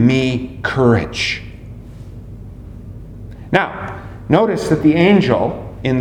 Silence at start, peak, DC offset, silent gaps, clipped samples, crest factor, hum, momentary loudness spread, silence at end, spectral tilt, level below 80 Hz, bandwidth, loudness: 0 s; 0 dBFS; under 0.1%; none; under 0.1%; 16 dB; none; 23 LU; 0 s; -6.5 dB/octave; -38 dBFS; 12.5 kHz; -16 LUFS